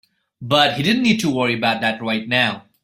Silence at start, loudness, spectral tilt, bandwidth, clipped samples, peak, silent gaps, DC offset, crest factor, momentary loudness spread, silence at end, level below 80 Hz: 0.4 s; -18 LUFS; -4.5 dB/octave; 16 kHz; under 0.1%; -2 dBFS; none; under 0.1%; 18 dB; 5 LU; 0.25 s; -56 dBFS